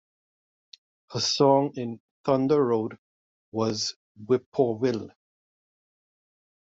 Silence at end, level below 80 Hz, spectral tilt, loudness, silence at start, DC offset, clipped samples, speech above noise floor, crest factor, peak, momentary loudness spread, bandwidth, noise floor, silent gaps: 1.55 s; -70 dBFS; -5 dB/octave; -26 LUFS; 1.1 s; under 0.1%; under 0.1%; over 65 dB; 20 dB; -8 dBFS; 15 LU; 8 kHz; under -90 dBFS; 2.00-2.24 s, 2.98-3.52 s, 3.96-4.15 s, 4.46-4.52 s